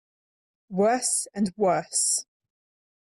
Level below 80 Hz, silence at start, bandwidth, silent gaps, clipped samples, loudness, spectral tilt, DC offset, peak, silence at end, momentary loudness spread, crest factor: -70 dBFS; 0.7 s; 15 kHz; none; under 0.1%; -24 LUFS; -3 dB/octave; under 0.1%; -12 dBFS; 0.85 s; 5 LU; 16 dB